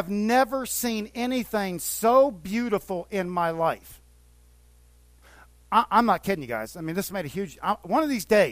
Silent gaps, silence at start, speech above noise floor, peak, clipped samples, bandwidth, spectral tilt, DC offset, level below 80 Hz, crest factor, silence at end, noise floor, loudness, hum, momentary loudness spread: none; 0 s; 30 dB; -6 dBFS; under 0.1%; 16 kHz; -4.5 dB/octave; under 0.1%; -54 dBFS; 20 dB; 0 s; -55 dBFS; -25 LUFS; 60 Hz at -55 dBFS; 10 LU